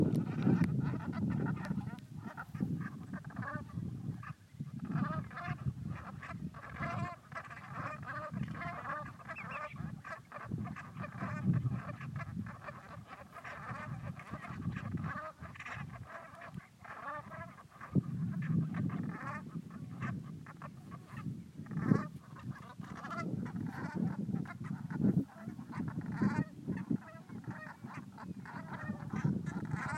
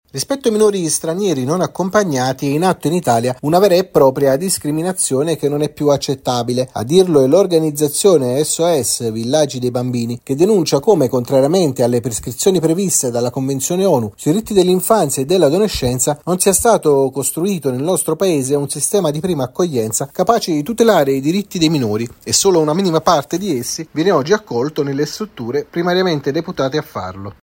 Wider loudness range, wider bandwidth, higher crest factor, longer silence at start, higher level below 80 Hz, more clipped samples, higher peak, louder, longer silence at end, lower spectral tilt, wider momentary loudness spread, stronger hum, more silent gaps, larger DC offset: first, 6 LU vs 3 LU; second, 13 kHz vs 16.5 kHz; first, 26 dB vs 16 dB; second, 0 s vs 0.15 s; second, -62 dBFS vs -48 dBFS; neither; second, -14 dBFS vs 0 dBFS; second, -40 LUFS vs -15 LUFS; about the same, 0 s vs 0.1 s; first, -8.5 dB/octave vs -4.5 dB/octave; first, 14 LU vs 7 LU; neither; neither; neither